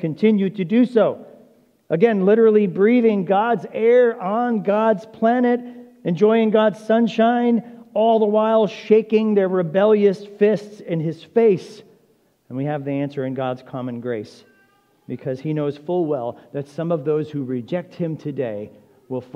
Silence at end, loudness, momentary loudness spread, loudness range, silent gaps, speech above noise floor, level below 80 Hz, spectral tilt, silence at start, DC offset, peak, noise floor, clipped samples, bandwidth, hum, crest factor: 0.1 s; -19 LUFS; 13 LU; 10 LU; none; 42 dB; -74 dBFS; -8.5 dB/octave; 0 s; under 0.1%; -2 dBFS; -60 dBFS; under 0.1%; 7 kHz; none; 16 dB